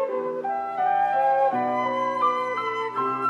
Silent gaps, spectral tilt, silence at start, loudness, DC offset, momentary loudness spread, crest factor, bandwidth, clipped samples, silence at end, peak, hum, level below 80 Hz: none; -5.5 dB/octave; 0 s; -24 LUFS; under 0.1%; 7 LU; 12 dB; 8.4 kHz; under 0.1%; 0 s; -12 dBFS; none; -76 dBFS